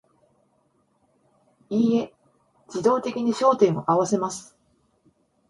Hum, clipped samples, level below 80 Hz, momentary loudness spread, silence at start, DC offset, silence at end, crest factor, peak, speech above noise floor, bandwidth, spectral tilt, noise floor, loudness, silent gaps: none; under 0.1%; -68 dBFS; 13 LU; 1.7 s; under 0.1%; 1.1 s; 20 dB; -6 dBFS; 45 dB; 11.5 kHz; -6 dB/octave; -67 dBFS; -23 LUFS; none